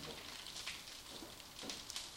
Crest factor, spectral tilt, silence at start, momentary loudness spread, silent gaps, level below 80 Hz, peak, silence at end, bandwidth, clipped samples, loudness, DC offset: 22 dB; -1 dB/octave; 0 s; 5 LU; none; -68 dBFS; -26 dBFS; 0 s; 16.5 kHz; under 0.1%; -47 LUFS; under 0.1%